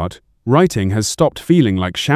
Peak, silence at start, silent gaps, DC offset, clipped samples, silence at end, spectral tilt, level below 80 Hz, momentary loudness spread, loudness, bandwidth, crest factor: 0 dBFS; 0 s; none; under 0.1%; under 0.1%; 0 s; -5.5 dB/octave; -36 dBFS; 7 LU; -15 LUFS; 15.5 kHz; 14 dB